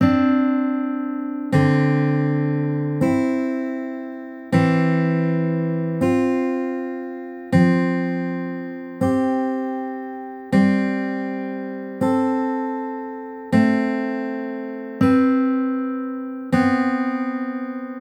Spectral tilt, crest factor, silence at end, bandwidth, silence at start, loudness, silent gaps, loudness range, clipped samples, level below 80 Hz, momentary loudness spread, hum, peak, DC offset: -8.5 dB/octave; 16 dB; 0 s; 9.8 kHz; 0 s; -21 LUFS; none; 2 LU; under 0.1%; -58 dBFS; 12 LU; none; -4 dBFS; under 0.1%